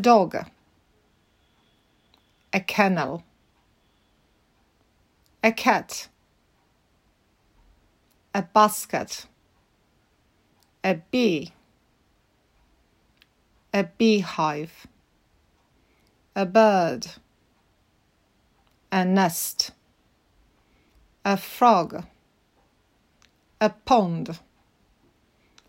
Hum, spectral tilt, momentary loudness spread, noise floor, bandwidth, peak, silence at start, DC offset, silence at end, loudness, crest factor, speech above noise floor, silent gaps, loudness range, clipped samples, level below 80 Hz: none; -4.5 dB/octave; 17 LU; -66 dBFS; 16 kHz; -4 dBFS; 0 s; under 0.1%; 1.3 s; -23 LUFS; 24 dB; 43 dB; none; 5 LU; under 0.1%; -64 dBFS